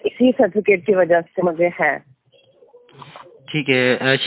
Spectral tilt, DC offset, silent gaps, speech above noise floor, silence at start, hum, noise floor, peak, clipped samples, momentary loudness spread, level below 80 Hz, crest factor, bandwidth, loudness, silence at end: -9 dB/octave; under 0.1%; none; 39 dB; 0.05 s; none; -55 dBFS; -2 dBFS; under 0.1%; 7 LU; -62 dBFS; 18 dB; 4 kHz; -17 LUFS; 0 s